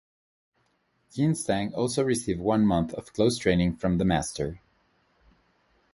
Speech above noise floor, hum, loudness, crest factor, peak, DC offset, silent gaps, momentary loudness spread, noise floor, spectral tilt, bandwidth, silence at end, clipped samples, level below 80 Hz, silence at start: 45 dB; none; -26 LUFS; 20 dB; -8 dBFS; under 0.1%; none; 9 LU; -71 dBFS; -6 dB/octave; 11.5 kHz; 1.35 s; under 0.1%; -48 dBFS; 1.15 s